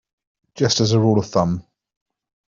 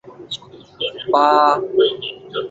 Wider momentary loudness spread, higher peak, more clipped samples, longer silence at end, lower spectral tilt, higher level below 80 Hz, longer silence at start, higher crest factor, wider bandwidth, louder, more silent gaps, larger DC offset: second, 7 LU vs 17 LU; about the same, -4 dBFS vs -2 dBFS; neither; first, 0.85 s vs 0 s; about the same, -5.5 dB/octave vs -4.5 dB/octave; first, -52 dBFS vs -62 dBFS; first, 0.55 s vs 0.05 s; about the same, 18 dB vs 18 dB; about the same, 7.4 kHz vs 7.8 kHz; about the same, -19 LUFS vs -17 LUFS; neither; neither